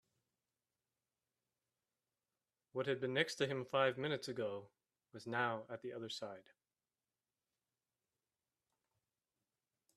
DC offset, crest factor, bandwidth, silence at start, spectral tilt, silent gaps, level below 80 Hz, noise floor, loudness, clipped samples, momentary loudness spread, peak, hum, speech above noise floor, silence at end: under 0.1%; 26 dB; 13 kHz; 2.75 s; -4.5 dB/octave; none; -86 dBFS; under -90 dBFS; -40 LUFS; under 0.1%; 15 LU; -20 dBFS; none; over 49 dB; 3.55 s